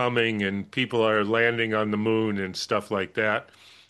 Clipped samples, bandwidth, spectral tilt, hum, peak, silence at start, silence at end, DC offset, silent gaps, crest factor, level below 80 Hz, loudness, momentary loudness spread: under 0.1%; 12.5 kHz; -5.5 dB/octave; none; -8 dBFS; 0 s; 0.45 s; under 0.1%; none; 16 dB; -66 dBFS; -25 LUFS; 6 LU